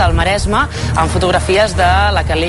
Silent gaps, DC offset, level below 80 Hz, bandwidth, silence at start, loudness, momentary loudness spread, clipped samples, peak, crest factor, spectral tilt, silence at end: none; under 0.1%; -20 dBFS; 11.5 kHz; 0 s; -13 LUFS; 4 LU; under 0.1%; -2 dBFS; 12 dB; -5 dB/octave; 0 s